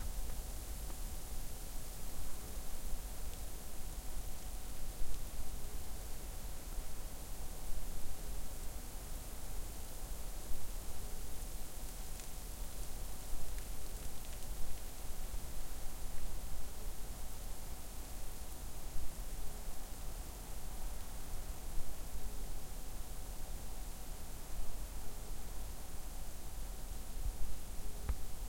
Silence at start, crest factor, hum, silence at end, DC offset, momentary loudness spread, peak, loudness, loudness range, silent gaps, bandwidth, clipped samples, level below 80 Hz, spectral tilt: 0 s; 14 dB; none; 0 s; under 0.1%; 2 LU; -22 dBFS; -48 LUFS; 1 LU; none; 16.5 kHz; under 0.1%; -44 dBFS; -3.5 dB/octave